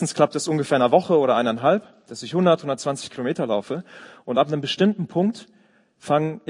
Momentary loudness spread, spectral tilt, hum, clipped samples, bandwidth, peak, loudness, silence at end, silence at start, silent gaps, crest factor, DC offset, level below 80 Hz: 14 LU; -5.5 dB/octave; none; under 0.1%; 11 kHz; -2 dBFS; -22 LUFS; 0.1 s; 0 s; none; 20 dB; under 0.1%; -70 dBFS